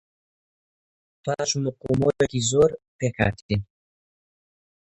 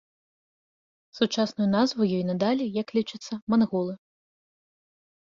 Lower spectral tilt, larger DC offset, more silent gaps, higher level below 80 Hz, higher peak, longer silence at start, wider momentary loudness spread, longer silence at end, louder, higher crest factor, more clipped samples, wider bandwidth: about the same, -5 dB/octave vs -6 dB/octave; neither; first, 2.88-2.99 s, 3.42-3.49 s vs 3.42-3.47 s; first, -48 dBFS vs -68 dBFS; first, -4 dBFS vs -10 dBFS; about the same, 1.25 s vs 1.15 s; about the same, 9 LU vs 10 LU; about the same, 1.25 s vs 1.25 s; about the same, -24 LUFS vs -26 LUFS; about the same, 22 dB vs 18 dB; neither; first, 10.5 kHz vs 7.4 kHz